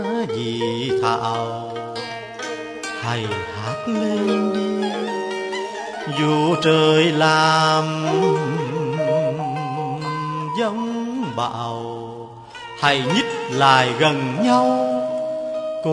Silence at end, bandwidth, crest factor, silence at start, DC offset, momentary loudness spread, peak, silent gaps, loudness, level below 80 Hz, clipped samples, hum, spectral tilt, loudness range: 0 s; 10.5 kHz; 20 dB; 0 s; under 0.1%; 14 LU; 0 dBFS; none; -20 LUFS; -62 dBFS; under 0.1%; none; -5 dB/octave; 7 LU